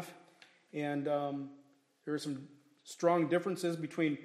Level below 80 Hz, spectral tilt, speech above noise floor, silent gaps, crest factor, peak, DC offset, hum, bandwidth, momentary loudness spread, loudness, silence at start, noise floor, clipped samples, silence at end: -86 dBFS; -6 dB/octave; 29 dB; none; 20 dB; -16 dBFS; under 0.1%; none; 14.5 kHz; 18 LU; -35 LUFS; 0 s; -63 dBFS; under 0.1%; 0 s